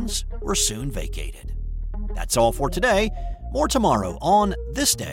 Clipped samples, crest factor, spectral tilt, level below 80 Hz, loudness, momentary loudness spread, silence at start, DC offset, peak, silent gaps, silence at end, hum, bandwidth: under 0.1%; 16 dB; -3.5 dB/octave; -30 dBFS; -22 LUFS; 14 LU; 0 s; under 0.1%; -6 dBFS; none; 0 s; none; 17 kHz